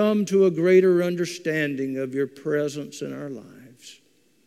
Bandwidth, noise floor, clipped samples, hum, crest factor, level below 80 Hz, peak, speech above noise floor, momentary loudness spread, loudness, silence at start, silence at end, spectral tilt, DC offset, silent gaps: 13.5 kHz; -62 dBFS; under 0.1%; none; 16 dB; -76 dBFS; -6 dBFS; 40 dB; 16 LU; -23 LUFS; 0 s; 0.55 s; -6 dB/octave; under 0.1%; none